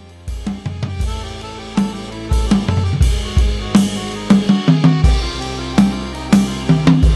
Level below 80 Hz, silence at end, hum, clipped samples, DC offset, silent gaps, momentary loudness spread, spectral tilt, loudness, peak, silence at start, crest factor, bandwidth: -20 dBFS; 0 s; none; under 0.1%; under 0.1%; none; 13 LU; -6.5 dB/octave; -16 LUFS; 0 dBFS; 0 s; 16 dB; 12.5 kHz